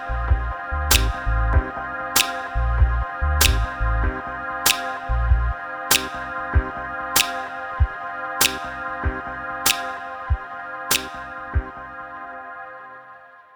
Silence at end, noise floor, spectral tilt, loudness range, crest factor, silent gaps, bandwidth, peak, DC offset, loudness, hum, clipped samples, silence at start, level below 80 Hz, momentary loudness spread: 0.15 s; -45 dBFS; -2.5 dB/octave; 4 LU; 22 dB; none; over 20 kHz; 0 dBFS; under 0.1%; -22 LUFS; none; under 0.1%; 0 s; -26 dBFS; 16 LU